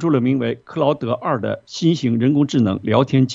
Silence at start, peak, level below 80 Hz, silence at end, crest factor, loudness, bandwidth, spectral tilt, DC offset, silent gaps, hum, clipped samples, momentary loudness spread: 0 s; -2 dBFS; -58 dBFS; 0 s; 16 dB; -19 LUFS; 7.8 kHz; -7 dB/octave; under 0.1%; none; none; under 0.1%; 5 LU